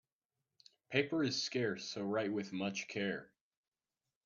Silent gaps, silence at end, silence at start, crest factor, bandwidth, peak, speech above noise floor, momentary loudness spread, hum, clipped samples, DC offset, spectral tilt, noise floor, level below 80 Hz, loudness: none; 1 s; 0.9 s; 24 dB; 7.4 kHz; -16 dBFS; over 52 dB; 5 LU; none; under 0.1%; under 0.1%; -4.5 dB/octave; under -90 dBFS; -82 dBFS; -38 LUFS